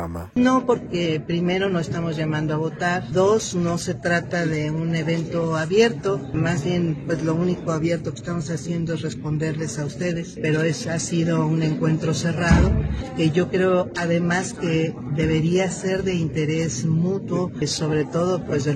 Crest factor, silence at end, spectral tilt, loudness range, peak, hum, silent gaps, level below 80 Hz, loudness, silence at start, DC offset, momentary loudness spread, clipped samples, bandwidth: 18 dB; 0 s; -6 dB/octave; 4 LU; -2 dBFS; none; none; -38 dBFS; -22 LUFS; 0 s; under 0.1%; 7 LU; under 0.1%; 9.8 kHz